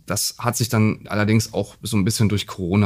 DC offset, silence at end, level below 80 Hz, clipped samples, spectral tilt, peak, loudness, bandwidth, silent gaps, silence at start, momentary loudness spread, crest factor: under 0.1%; 0 s; -50 dBFS; under 0.1%; -5 dB/octave; -4 dBFS; -21 LUFS; 15.5 kHz; none; 0.1 s; 5 LU; 16 dB